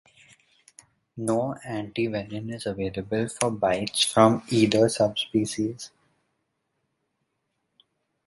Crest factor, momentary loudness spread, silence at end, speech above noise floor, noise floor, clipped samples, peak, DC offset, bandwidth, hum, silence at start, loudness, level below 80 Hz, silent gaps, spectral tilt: 24 dB; 13 LU; 2.4 s; 53 dB; -77 dBFS; under 0.1%; -4 dBFS; under 0.1%; 11.5 kHz; none; 1.15 s; -25 LUFS; -58 dBFS; none; -4.5 dB/octave